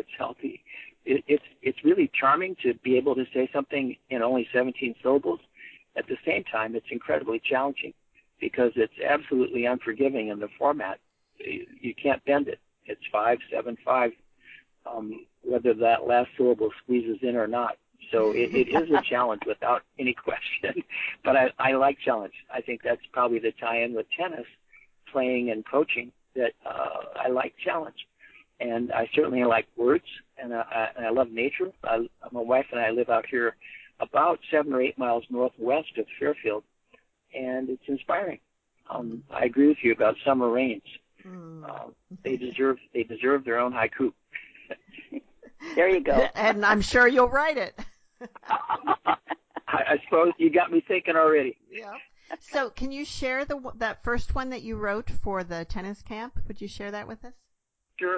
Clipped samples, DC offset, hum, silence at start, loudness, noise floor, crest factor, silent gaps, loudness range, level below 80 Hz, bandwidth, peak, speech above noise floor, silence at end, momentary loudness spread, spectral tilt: under 0.1%; under 0.1%; none; 0.1 s; -26 LUFS; -76 dBFS; 20 dB; none; 6 LU; -50 dBFS; 8 kHz; -8 dBFS; 50 dB; 0 s; 17 LU; -5.5 dB/octave